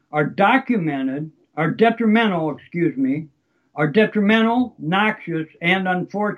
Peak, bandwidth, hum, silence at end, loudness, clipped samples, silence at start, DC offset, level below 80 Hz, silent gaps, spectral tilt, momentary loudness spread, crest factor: -2 dBFS; 6.4 kHz; none; 0 s; -19 LUFS; under 0.1%; 0.15 s; under 0.1%; -68 dBFS; none; -8 dB/octave; 10 LU; 16 dB